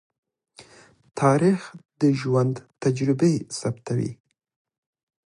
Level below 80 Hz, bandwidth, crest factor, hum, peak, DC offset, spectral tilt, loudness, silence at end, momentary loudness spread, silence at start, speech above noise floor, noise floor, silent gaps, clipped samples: -64 dBFS; 11.5 kHz; 18 dB; none; -6 dBFS; under 0.1%; -7 dB/octave; -23 LUFS; 1.15 s; 9 LU; 0.6 s; 30 dB; -53 dBFS; 1.85-1.89 s; under 0.1%